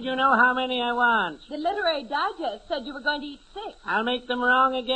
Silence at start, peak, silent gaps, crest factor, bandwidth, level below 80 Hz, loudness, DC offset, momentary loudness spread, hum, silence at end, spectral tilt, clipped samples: 0 s; -6 dBFS; none; 18 dB; 8.8 kHz; -56 dBFS; -24 LUFS; under 0.1%; 13 LU; none; 0 s; -4 dB/octave; under 0.1%